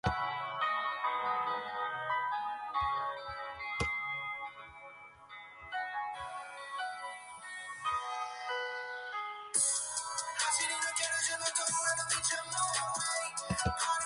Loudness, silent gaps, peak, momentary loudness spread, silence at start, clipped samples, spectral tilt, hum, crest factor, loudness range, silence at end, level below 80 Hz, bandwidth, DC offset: -34 LUFS; none; -16 dBFS; 13 LU; 0.05 s; under 0.1%; -1 dB/octave; none; 20 dB; 9 LU; 0 s; -58 dBFS; 11.5 kHz; under 0.1%